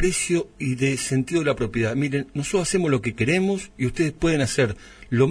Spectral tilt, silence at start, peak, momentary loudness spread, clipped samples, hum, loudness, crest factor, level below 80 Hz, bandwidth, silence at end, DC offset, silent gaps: -5 dB/octave; 0 s; -6 dBFS; 5 LU; under 0.1%; none; -23 LUFS; 16 dB; -42 dBFS; 11 kHz; 0 s; under 0.1%; none